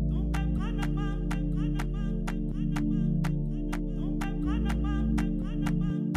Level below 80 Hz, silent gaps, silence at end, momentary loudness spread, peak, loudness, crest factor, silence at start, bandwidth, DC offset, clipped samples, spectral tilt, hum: -32 dBFS; none; 0 s; 4 LU; -16 dBFS; -31 LUFS; 12 dB; 0 s; 12.5 kHz; under 0.1%; under 0.1%; -7.5 dB/octave; none